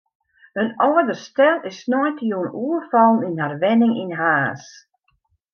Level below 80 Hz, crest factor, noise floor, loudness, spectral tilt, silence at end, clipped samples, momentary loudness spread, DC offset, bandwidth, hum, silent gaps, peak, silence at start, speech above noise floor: -72 dBFS; 16 dB; -67 dBFS; -19 LUFS; -6.5 dB/octave; 0.9 s; under 0.1%; 9 LU; under 0.1%; 6.8 kHz; none; none; -4 dBFS; 0.55 s; 48 dB